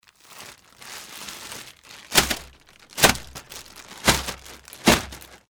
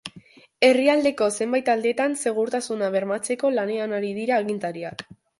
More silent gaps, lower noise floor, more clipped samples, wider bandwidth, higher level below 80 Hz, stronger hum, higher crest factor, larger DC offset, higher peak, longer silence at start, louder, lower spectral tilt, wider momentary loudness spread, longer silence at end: neither; about the same, -50 dBFS vs -50 dBFS; neither; first, over 20 kHz vs 11.5 kHz; first, -42 dBFS vs -68 dBFS; neither; about the same, 22 dB vs 20 dB; neither; about the same, -4 dBFS vs -4 dBFS; first, 0.3 s vs 0.05 s; about the same, -21 LUFS vs -23 LUFS; second, -2 dB/octave vs -4 dB/octave; first, 23 LU vs 11 LU; about the same, 0.35 s vs 0.35 s